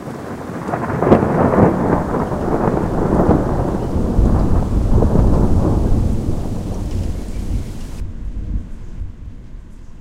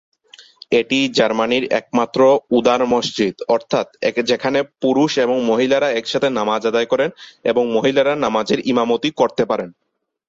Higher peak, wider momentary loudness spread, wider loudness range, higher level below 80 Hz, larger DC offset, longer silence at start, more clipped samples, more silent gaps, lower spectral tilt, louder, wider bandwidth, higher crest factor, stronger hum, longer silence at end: about the same, 0 dBFS vs -2 dBFS; first, 16 LU vs 5 LU; first, 11 LU vs 1 LU; first, -22 dBFS vs -58 dBFS; neither; second, 0 s vs 0.7 s; neither; neither; first, -9 dB/octave vs -4.5 dB/octave; about the same, -18 LUFS vs -17 LUFS; first, 13 kHz vs 7.8 kHz; about the same, 16 dB vs 16 dB; neither; second, 0 s vs 0.55 s